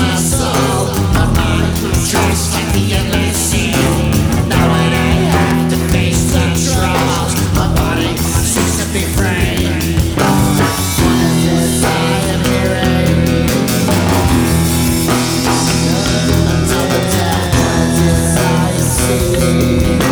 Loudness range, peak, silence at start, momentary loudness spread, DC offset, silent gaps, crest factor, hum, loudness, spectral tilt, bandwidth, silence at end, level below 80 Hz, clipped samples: 1 LU; 0 dBFS; 0 s; 2 LU; under 0.1%; none; 12 dB; none; -13 LUFS; -5 dB/octave; over 20 kHz; 0 s; -22 dBFS; under 0.1%